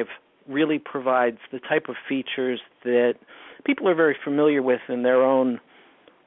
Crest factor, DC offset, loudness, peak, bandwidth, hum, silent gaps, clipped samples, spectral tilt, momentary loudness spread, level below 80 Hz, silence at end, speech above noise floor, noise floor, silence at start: 16 dB; under 0.1%; -23 LUFS; -8 dBFS; 4 kHz; none; none; under 0.1%; -10 dB/octave; 11 LU; -76 dBFS; 0.7 s; 32 dB; -54 dBFS; 0 s